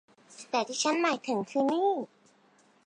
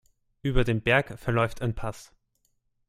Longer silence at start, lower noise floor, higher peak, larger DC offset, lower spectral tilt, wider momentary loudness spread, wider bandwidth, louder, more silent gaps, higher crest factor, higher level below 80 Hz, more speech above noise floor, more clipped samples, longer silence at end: second, 0.3 s vs 0.45 s; second, -64 dBFS vs -73 dBFS; second, -14 dBFS vs -8 dBFS; neither; second, -3 dB/octave vs -6.5 dB/octave; second, 10 LU vs 13 LU; second, 10.5 kHz vs 14.5 kHz; about the same, -29 LUFS vs -27 LUFS; neither; about the same, 16 dB vs 20 dB; second, -86 dBFS vs -38 dBFS; second, 35 dB vs 47 dB; neither; about the same, 0.8 s vs 0.85 s